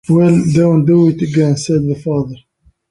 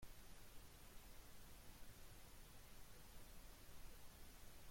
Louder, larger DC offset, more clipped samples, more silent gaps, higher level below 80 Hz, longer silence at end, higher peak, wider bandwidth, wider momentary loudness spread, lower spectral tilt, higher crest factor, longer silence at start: first, -13 LUFS vs -64 LUFS; neither; neither; neither; first, -46 dBFS vs -64 dBFS; first, 0.55 s vs 0 s; first, -2 dBFS vs -44 dBFS; second, 11 kHz vs 16.5 kHz; first, 8 LU vs 1 LU; first, -8 dB/octave vs -3 dB/octave; about the same, 12 dB vs 14 dB; about the same, 0.1 s vs 0 s